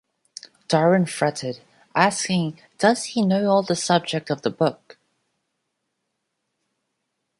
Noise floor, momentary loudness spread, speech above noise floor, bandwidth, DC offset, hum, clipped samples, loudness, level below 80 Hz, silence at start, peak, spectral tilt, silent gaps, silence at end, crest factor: -77 dBFS; 16 LU; 57 dB; 11.5 kHz; under 0.1%; none; under 0.1%; -21 LUFS; -68 dBFS; 0.7 s; -2 dBFS; -5 dB/octave; none; 2.65 s; 22 dB